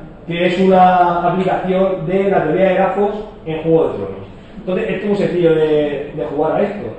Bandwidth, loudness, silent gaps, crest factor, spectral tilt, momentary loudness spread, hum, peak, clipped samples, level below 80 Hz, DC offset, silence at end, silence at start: 8.6 kHz; -15 LUFS; none; 14 dB; -8 dB/octave; 14 LU; none; -2 dBFS; under 0.1%; -42 dBFS; under 0.1%; 0 s; 0 s